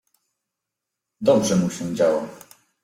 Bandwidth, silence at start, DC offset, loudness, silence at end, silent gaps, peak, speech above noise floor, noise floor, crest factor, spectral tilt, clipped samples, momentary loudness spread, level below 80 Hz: 16 kHz; 1.2 s; under 0.1%; -21 LUFS; 0.45 s; none; -6 dBFS; 64 dB; -84 dBFS; 18 dB; -5.5 dB/octave; under 0.1%; 9 LU; -60 dBFS